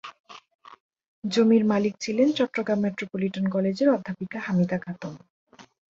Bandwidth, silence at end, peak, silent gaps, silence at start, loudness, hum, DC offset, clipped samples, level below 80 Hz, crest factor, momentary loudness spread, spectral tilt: 8 kHz; 0.3 s; -8 dBFS; 0.20-0.24 s, 0.55-0.59 s, 0.80-0.90 s, 1.08-1.22 s, 5.30-5.47 s; 0.05 s; -24 LUFS; none; under 0.1%; under 0.1%; -68 dBFS; 18 dB; 15 LU; -6.5 dB/octave